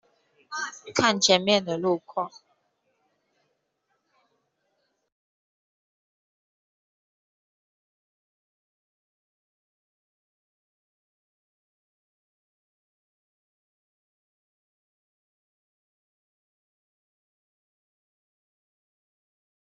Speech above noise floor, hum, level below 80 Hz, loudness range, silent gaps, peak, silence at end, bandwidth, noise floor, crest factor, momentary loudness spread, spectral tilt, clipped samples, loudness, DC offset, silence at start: 51 dB; none; -78 dBFS; 15 LU; none; -6 dBFS; 17.5 s; 7.4 kHz; -76 dBFS; 28 dB; 14 LU; -2 dB/octave; under 0.1%; -24 LUFS; under 0.1%; 0.5 s